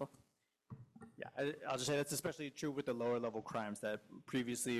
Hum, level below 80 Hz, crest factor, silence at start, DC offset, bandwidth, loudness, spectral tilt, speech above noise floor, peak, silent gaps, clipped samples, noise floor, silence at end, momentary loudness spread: none; -78 dBFS; 16 dB; 0 s; under 0.1%; 15.5 kHz; -41 LUFS; -4 dB/octave; 37 dB; -26 dBFS; none; under 0.1%; -77 dBFS; 0 s; 18 LU